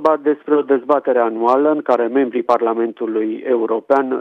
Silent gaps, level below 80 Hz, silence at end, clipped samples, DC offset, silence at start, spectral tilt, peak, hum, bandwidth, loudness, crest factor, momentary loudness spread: none; -70 dBFS; 0 s; under 0.1%; under 0.1%; 0 s; -7 dB/octave; -2 dBFS; none; 6.2 kHz; -17 LUFS; 14 dB; 5 LU